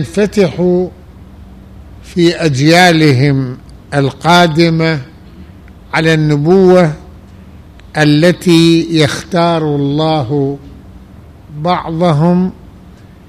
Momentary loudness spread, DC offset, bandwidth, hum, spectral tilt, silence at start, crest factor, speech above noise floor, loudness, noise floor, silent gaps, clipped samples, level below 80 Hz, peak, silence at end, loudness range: 12 LU; 0.2%; 14.5 kHz; none; -6 dB/octave; 0 s; 12 dB; 27 dB; -11 LUFS; -36 dBFS; none; under 0.1%; -38 dBFS; 0 dBFS; 0.4 s; 4 LU